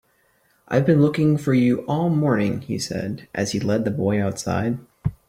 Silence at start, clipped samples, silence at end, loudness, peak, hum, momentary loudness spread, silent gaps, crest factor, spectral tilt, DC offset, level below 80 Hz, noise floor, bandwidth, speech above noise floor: 0.7 s; under 0.1%; 0.15 s; -22 LUFS; -4 dBFS; none; 9 LU; none; 16 dB; -6.5 dB/octave; under 0.1%; -52 dBFS; -63 dBFS; 15.5 kHz; 42 dB